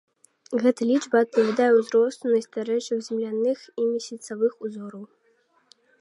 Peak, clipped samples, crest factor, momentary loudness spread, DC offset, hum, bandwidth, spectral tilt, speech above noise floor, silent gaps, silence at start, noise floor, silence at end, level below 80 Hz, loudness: -6 dBFS; under 0.1%; 18 dB; 15 LU; under 0.1%; none; 11.5 kHz; -5 dB/octave; 42 dB; none; 0.5 s; -65 dBFS; 0.95 s; -82 dBFS; -24 LUFS